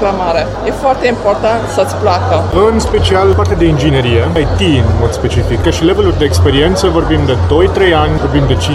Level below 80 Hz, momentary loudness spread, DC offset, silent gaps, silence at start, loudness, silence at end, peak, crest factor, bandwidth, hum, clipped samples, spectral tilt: -20 dBFS; 4 LU; under 0.1%; none; 0 s; -11 LUFS; 0 s; 0 dBFS; 10 dB; 12.5 kHz; none; 0.1%; -6 dB/octave